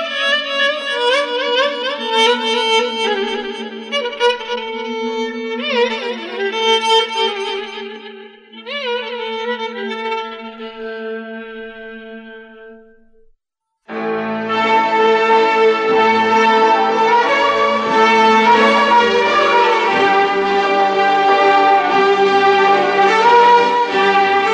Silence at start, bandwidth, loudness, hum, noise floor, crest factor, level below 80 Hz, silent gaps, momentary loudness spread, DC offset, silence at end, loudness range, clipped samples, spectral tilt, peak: 0 s; 10.5 kHz; -14 LUFS; none; -76 dBFS; 14 dB; -60 dBFS; none; 16 LU; under 0.1%; 0 s; 14 LU; under 0.1%; -3 dB/octave; 0 dBFS